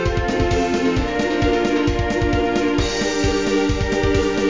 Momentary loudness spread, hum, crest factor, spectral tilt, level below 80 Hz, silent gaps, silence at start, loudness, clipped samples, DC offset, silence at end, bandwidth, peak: 2 LU; none; 14 dB; -5.5 dB/octave; -28 dBFS; none; 0 s; -19 LUFS; under 0.1%; 0.8%; 0 s; 7.6 kHz; -4 dBFS